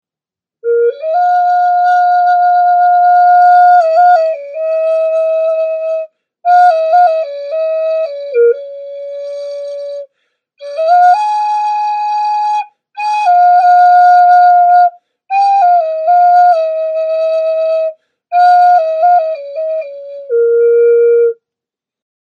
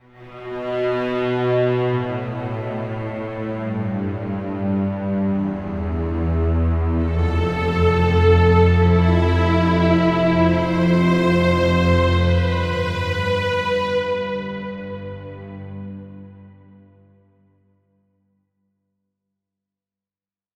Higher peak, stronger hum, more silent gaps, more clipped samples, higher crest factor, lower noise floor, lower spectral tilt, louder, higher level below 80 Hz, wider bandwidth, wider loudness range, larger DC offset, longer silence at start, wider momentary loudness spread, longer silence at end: about the same, 0 dBFS vs -2 dBFS; second, none vs 50 Hz at -60 dBFS; neither; neither; second, 10 dB vs 18 dB; about the same, -88 dBFS vs under -90 dBFS; second, 0 dB/octave vs -8 dB/octave; first, -10 LUFS vs -19 LUFS; second, -74 dBFS vs -32 dBFS; second, 7 kHz vs 7.8 kHz; second, 6 LU vs 12 LU; neither; first, 0.65 s vs 0.2 s; about the same, 15 LU vs 15 LU; second, 1 s vs 4.05 s